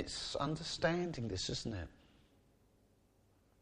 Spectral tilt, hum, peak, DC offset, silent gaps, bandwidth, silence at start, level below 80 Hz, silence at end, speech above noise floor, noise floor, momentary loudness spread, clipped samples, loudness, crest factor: -4.5 dB/octave; none; -20 dBFS; under 0.1%; none; 10.5 kHz; 0 s; -60 dBFS; 1.7 s; 32 dB; -71 dBFS; 9 LU; under 0.1%; -39 LUFS; 22 dB